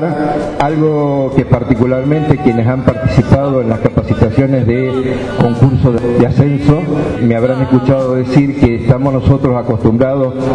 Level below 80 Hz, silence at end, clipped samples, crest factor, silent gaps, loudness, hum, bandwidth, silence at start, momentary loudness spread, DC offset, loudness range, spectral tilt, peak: -30 dBFS; 0 s; 0.3%; 12 dB; none; -12 LUFS; none; 9.8 kHz; 0 s; 3 LU; 0.2%; 1 LU; -9 dB/octave; 0 dBFS